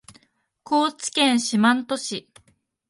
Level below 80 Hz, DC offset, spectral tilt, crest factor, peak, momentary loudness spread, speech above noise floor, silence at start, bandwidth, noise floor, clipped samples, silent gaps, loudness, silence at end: -70 dBFS; under 0.1%; -3 dB/octave; 18 dB; -4 dBFS; 10 LU; 42 dB; 0.7 s; 11.5 kHz; -63 dBFS; under 0.1%; none; -21 LUFS; 0.7 s